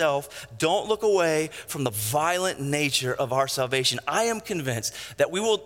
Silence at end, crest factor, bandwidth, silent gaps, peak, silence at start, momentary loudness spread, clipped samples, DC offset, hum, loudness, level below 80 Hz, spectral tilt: 0 s; 18 dB; 17 kHz; none; -8 dBFS; 0 s; 7 LU; under 0.1%; under 0.1%; none; -25 LUFS; -62 dBFS; -3.5 dB/octave